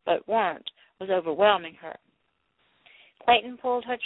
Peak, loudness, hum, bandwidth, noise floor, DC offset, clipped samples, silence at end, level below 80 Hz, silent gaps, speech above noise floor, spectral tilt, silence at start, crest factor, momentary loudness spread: -8 dBFS; -25 LUFS; none; 4.1 kHz; -73 dBFS; under 0.1%; under 0.1%; 0 s; -68 dBFS; none; 48 dB; -7.5 dB/octave; 0.05 s; 20 dB; 18 LU